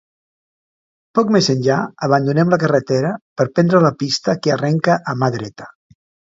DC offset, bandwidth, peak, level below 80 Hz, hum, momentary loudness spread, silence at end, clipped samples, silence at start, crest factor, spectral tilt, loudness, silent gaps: under 0.1%; 7.8 kHz; 0 dBFS; -58 dBFS; none; 7 LU; 0.6 s; under 0.1%; 1.15 s; 18 dB; -6 dB/octave; -17 LUFS; 3.21-3.36 s